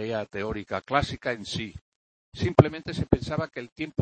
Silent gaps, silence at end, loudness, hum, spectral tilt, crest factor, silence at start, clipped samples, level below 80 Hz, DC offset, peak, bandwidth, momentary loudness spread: 1.81-2.32 s, 3.72-3.76 s; 0 s; -27 LUFS; none; -6.5 dB/octave; 26 dB; 0 s; under 0.1%; -46 dBFS; under 0.1%; 0 dBFS; 8.8 kHz; 14 LU